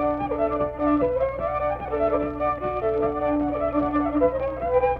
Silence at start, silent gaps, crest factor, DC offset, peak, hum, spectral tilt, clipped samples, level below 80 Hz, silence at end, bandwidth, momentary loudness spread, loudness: 0 s; none; 14 dB; under 0.1%; -8 dBFS; none; -10 dB/octave; under 0.1%; -42 dBFS; 0 s; 4.7 kHz; 4 LU; -24 LUFS